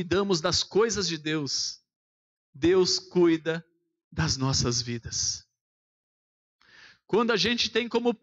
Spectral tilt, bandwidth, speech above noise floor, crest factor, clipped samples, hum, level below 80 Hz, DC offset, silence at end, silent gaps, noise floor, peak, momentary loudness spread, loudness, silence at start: -3.5 dB/octave; 8.2 kHz; 29 dB; 14 dB; under 0.1%; none; -52 dBFS; under 0.1%; 0.1 s; 1.96-2.53 s, 4.04-4.11 s, 5.61-6.59 s; -55 dBFS; -14 dBFS; 8 LU; -26 LUFS; 0 s